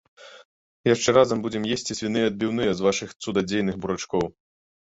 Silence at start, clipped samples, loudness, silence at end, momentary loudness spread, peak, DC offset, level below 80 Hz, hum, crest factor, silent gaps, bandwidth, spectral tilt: 0.2 s; under 0.1%; -24 LUFS; 0.55 s; 9 LU; -4 dBFS; under 0.1%; -54 dBFS; none; 20 dB; 0.45-0.84 s; 8 kHz; -4.5 dB/octave